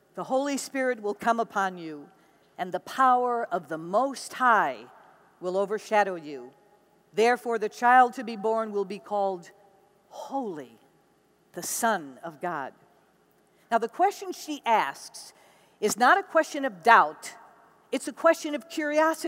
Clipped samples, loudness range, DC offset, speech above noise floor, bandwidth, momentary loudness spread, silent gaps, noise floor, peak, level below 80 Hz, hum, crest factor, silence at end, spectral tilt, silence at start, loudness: under 0.1%; 9 LU; under 0.1%; 38 dB; 16 kHz; 19 LU; none; -65 dBFS; -4 dBFS; -82 dBFS; none; 24 dB; 0 s; -3 dB/octave; 0.15 s; -26 LUFS